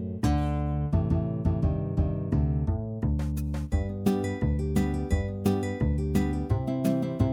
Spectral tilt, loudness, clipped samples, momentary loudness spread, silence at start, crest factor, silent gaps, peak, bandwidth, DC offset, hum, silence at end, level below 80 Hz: -8 dB/octave; -28 LUFS; under 0.1%; 3 LU; 0 s; 16 dB; none; -12 dBFS; 17.5 kHz; under 0.1%; none; 0 s; -34 dBFS